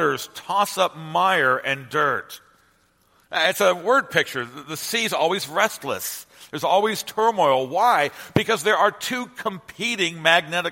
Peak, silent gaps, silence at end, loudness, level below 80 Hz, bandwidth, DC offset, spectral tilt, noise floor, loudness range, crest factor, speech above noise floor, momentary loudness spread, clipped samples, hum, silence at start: 0 dBFS; none; 0 s; -21 LUFS; -62 dBFS; 16.5 kHz; under 0.1%; -3 dB/octave; -61 dBFS; 2 LU; 22 dB; 40 dB; 11 LU; under 0.1%; none; 0 s